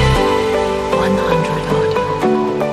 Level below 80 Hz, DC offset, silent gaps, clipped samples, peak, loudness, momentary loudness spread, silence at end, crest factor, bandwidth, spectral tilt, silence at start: -28 dBFS; under 0.1%; none; under 0.1%; -2 dBFS; -16 LUFS; 2 LU; 0 s; 14 dB; 15 kHz; -6 dB/octave; 0 s